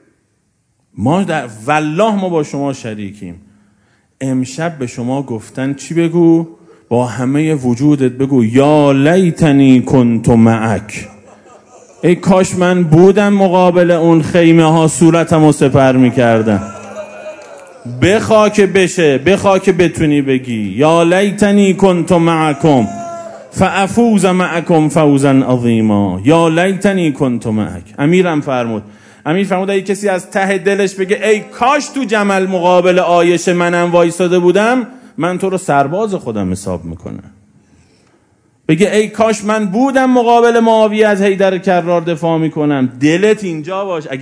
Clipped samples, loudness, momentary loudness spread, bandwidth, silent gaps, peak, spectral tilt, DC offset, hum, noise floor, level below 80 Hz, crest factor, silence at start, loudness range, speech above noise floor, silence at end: 0.6%; -12 LUFS; 11 LU; 11 kHz; none; 0 dBFS; -6.5 dB/octave; under 0.1%; none; -60 dBFS; -46 dBFS; 12 dB; 0.95 s; 7 LU; 49 dB; 0 s